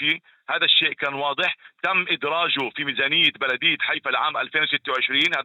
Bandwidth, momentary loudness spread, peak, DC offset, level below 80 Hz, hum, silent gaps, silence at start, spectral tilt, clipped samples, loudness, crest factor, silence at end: 17.5 kHz; 7 LU; -4 dBFS; under 0.1%; -76 dBFS; none; none; 0 s; -3.5 dB/octave; under 0.1%; -21 LUFS; 18 dB; 0 s